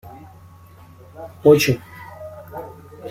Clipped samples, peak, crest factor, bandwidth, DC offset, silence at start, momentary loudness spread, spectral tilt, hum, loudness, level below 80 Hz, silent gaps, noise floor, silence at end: under 0.1%; -2 dBFS; 20 dB; 16 kHz; under 0.1%; 0.05 s; 25 LU; -5.5 dB/octave; none; -16 LUFS; -54 dBFS; none; -45 dBFS; 0 s